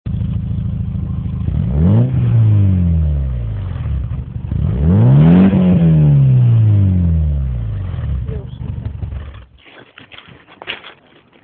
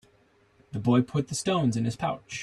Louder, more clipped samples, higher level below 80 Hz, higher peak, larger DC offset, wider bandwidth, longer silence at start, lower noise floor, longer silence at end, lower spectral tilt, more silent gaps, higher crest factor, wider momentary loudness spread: first, -14 LUFS vs -27 LUFS; neither; first, -22 dBFS vs -60 dBFS; first, 0 dBFS vs -10 dBFS; neither; second, 3.9 kHz vs 12.5 kHz; second, 0.05 s vs 0.75 s; second, -48 dBFS vs -63 dBFS; first, 0.55 s vs 0 s; first, -13.5 dB/octave vs -6 dB/octave; neither; about the same, 14 dB vs 18 dB; first, 16 LU vs 7 LU